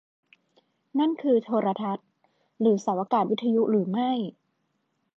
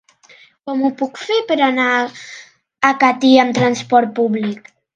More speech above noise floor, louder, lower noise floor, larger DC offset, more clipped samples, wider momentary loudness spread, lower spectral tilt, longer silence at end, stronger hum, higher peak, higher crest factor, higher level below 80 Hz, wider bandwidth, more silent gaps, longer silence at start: first, 50 dB vs 32 dB; second, -26 LUFS vs -16 LUFS; first, -75 dBFS vs -48 dBFS; neither; neither; second, 8 LU vs 13 LU; first, -7.5 dB/octave vs -4.5 dB/octave; first, 0.9 s vs 0.4 s; neither; second, -10 dBFS vs 0 dBFS; about the same, 16 dB vs 16 dB; second, -82 dBFS vs -66 dBFS; second, 7.6 kHz vs 9 kHz; neither; first, 0.95 s vs 0.65 s